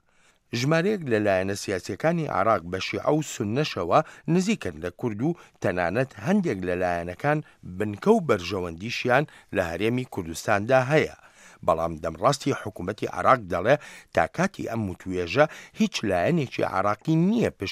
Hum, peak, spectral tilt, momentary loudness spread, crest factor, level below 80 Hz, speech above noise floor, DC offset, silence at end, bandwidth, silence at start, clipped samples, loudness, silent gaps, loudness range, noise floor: none; -4 dBFS; -6 dB/octave; 9 LU; 22 dB; -56 dBFS; 37 dB; under 0.1%; 0 s; 15.5 kHz; 0.55 s; under 0.1%; -25 LUFS; none; 1 LU; -62 dBFS